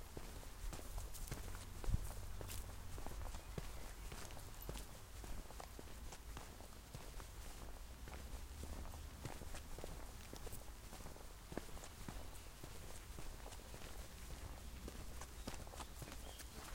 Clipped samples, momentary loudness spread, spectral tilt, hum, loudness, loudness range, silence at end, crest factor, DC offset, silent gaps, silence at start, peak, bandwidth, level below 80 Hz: under 0.1%; 5 LU; -4 dB/octave; none; -53 LUFS; 4 LU; 0 s; 24 dB; under 0.1%; none; 0 s; -26 dBFS; 16 kHz; -52 dBFS